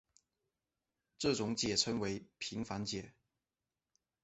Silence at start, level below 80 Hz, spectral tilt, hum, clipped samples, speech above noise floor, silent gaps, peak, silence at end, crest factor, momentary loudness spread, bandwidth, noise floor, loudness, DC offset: 1.2 s; -66 dBFS; -3.5 dB/octave; none; under 0.1%; over 52 dB; none; -18 dBFS; 1.15 s; 24 dB; 10 LU; 8.2 kHz; under -90 dBFS; -37 LUFS; under 0.1%